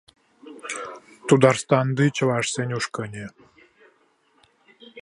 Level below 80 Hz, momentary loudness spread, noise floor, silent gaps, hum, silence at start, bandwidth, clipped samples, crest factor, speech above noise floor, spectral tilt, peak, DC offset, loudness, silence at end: -64 dBFS; 20 LU; -63 dBFS; none; none; 0.45 s; 11.5 kHz; under 0.1%; 22 dB; 42 dB; -5.5 dB/octave; -2 dBFS; under 0.1%; -22 LUFS; 0 s